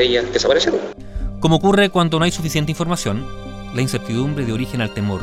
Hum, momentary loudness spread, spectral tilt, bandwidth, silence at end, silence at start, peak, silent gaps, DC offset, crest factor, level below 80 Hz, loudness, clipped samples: none; 13 LU; -5 dB/octave; 15.5 kHz; 0 s; 0 s; 0 dBFS; none; under 0.1%; 18 dB; -34 dBFS; -18 LUFS; under 0.1%